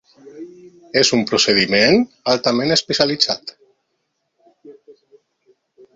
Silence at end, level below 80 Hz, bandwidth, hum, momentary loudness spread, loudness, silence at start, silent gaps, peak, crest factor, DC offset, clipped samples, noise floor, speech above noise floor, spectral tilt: 1.25 s; -56 dBFS; 7.8 kHz; none; 24 LU; -16 LUFS; 0.25 s; none; 0 dBFS; 20 dB; under 0.1%; under 0.1%; -72 dBFS; 55 dB; -3 dB/octave